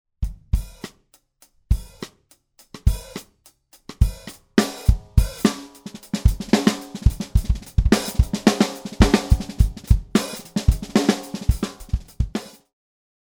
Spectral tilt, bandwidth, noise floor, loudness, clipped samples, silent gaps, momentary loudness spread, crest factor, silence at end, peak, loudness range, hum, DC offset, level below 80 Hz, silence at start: -5.5 dB/octave; over 20 kHz; -60 dBFS; -22 LUFS; under 0.1%; none; 19 LU; 20 dB; 0.8 s; 0 dBFS; 9 LU; none; under 0.1%; -26 dBFS; 0.2 s